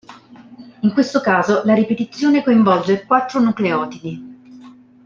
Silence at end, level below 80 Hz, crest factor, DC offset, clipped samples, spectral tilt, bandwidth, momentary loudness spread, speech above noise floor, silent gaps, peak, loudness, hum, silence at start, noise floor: 0.35 s; -62 dBFS; 16 dB; under 0.1%; under 0.1%; -6.5 dB/octave; 7.4 kHz; 10 LU; 26 dB; none; -2 dBFS; -16 LUFS; none; 0.1 s; -42 dBFS